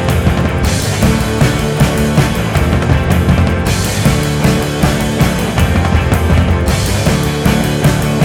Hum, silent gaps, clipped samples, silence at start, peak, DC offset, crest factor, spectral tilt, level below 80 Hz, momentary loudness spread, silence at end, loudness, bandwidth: none; none; under 0.1%; 0 s; 0 dBFS; under 0.1%; 12 dB; -5.5 dB/octave; -20 dBFS; 2 LU; 0 s; -13 LUFS; 18 kHz